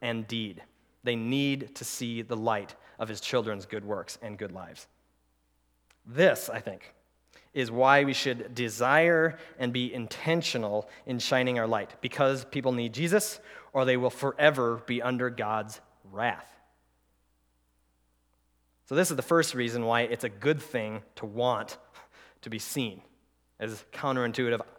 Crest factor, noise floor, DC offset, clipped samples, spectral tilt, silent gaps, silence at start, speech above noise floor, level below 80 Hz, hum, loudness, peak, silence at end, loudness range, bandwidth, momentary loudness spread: 26 dB; -71 dBFS; under 0.1%; under 0.1%; -4.5 dB/octave; none; 0 s; 42 dB; -72 dBFS; none; -29 LUFS; -4 dBFS; 0.1 s; 9 LU; 19 kHz; 16 LU